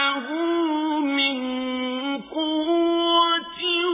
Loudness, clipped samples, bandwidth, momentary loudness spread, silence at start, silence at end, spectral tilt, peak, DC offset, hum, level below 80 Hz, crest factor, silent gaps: -22 LUFS; under 0.1%; 3.9 kHz; 8 LU; 0 s; 0 s; 1 dB/octave; -8 dBFS; under 0.1%; none; -64 dBFS; 14 dB; none